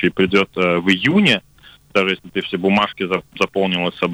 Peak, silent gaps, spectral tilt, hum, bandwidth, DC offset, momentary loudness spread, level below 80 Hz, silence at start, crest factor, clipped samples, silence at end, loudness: -4 dBFS; none; -5.5 dB/octave; none; 11.5 kHz; under 0.1%; 8 LU; -52 dBFS; 0 s; 14 dB; under 0.1%; 0 s; -17 LUFS